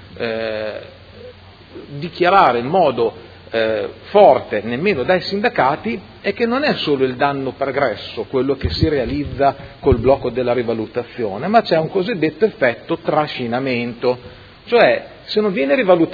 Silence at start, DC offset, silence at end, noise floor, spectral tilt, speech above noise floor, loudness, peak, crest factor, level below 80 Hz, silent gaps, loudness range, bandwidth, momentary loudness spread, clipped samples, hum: 0 s; under 0.1%; 0 s; -40 dBFS; -8 dB/octave; 23 dB; -18 LUFS; 0 dBFS; 18 dB; -40 dBFS; none; 3 LU; 5.4 kHz; 11 LU; under 0.1%; none